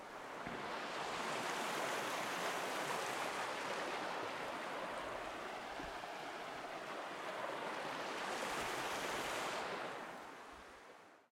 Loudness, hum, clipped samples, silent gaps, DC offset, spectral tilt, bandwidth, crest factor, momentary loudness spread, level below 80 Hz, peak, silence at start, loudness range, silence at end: -43 LUFS; none; under 0.1%; none; under 0.1%; -2.5 dB/octave; 16.5 kHz; 16 dB; 8 LU; -72 dBFS; -26 dBFS; 0 s; 5 LU; 0.1 s